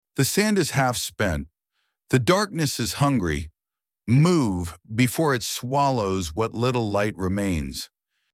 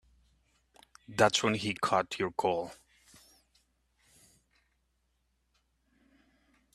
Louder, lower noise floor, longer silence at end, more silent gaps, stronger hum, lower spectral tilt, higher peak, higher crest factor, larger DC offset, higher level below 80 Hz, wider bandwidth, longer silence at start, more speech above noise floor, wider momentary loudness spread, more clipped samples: first, -23 LUFS vs -30 LUFS; first, -90 dBFS vs -77 dBFS; second, 0.45 s vs 4 s; neither; neither; first, -5 dB/octave vs -3.5 dB/octave; about the same, -6 dBFS vs -8 dBFS; second, 18 dB vs 28 dB; neither; first, -44 dBFS vs -68 dBFS; first, 16.5 kHz vs 14.5 kHz; second, 0.15 s vs 1.1 s; first, 67 dB vs 47 dB; about the same, 11 LU vs 11 LU; neither